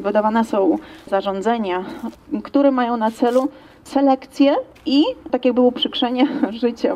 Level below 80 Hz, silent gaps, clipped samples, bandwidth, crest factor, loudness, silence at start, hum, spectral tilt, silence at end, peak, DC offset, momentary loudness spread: -56 dBFS; none; under 0.1%; 12.5 kHz; 14 dB; -19 LUFS; 0 s; none; -5.5 dB/octave; 0 s; -4 dBFS; under 0.1%; 8 LU